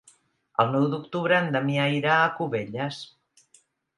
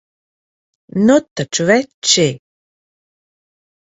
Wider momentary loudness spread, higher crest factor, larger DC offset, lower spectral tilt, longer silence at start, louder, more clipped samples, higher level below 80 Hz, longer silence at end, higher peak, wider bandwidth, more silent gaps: about the same, 10 LU vs 9 LU; about the same, 20 dB vs 18 dB; neither; first, -6.5 dB/octave vs -3.5 dB/octave; second, 0.6 s vs 0.95 s; second, -25 LUFS vs -14 LUFS; neither; second, -72 dBFS vs -58 dBFS; second, 0.9 s vs 1.6 s; second, -6 dBFS vs 0 dBFS; first, 11 kHz vs 8 kHz; second, none vs 1.31-1.36 s, 1.94-2.02 s